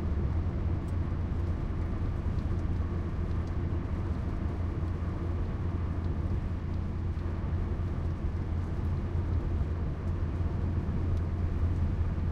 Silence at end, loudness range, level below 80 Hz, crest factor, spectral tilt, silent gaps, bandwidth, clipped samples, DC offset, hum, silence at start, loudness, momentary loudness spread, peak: 0 s; 1 LU; -36 dBFS; 12 dB; -9.5 dB/octave; none; 5.8 kHz; under 0.1%; under 0.1%; none; 0 s; -33 LUFS; 2 LU; -18 dBFS